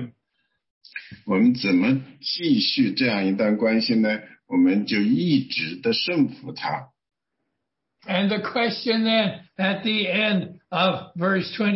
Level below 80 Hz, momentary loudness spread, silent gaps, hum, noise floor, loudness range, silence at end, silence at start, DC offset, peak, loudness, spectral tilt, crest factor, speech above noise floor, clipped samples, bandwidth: -66 dBFS; 9 LU; 0.70-0.81 s; none; -80 dBFS; 5 LU; 0 s; 0 s; under 0.1%; -8 dBFS; -22 LUFS; -8.5 dB/octave; 16 dB; 59 dB; under 0.1%; 6 kHz